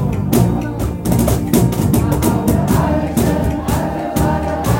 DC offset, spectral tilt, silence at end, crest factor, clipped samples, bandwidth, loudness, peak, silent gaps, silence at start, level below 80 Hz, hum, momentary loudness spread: under 0.1%; -6.5 dB/octave; 0 s; 14 dB; under 0.1%; 17 kHz; -16 LUFS; 0 dBFS; none; 0 s; -26 dBFS; none; 4 LU